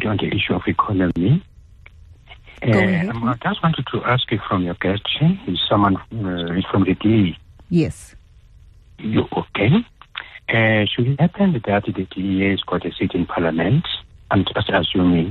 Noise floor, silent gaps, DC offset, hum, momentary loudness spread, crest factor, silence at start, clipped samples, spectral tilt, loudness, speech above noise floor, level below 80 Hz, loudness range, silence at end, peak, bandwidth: -47 dBFS; none; under 0.1%; none; 8 LU; 14 dB; 0 s; under 0.1%; -7.5 dB/octave; -19 LUFS; 28 dB; -44 dBFS; 2 LU; 0 s; -4 dBFS; 10.5 kHz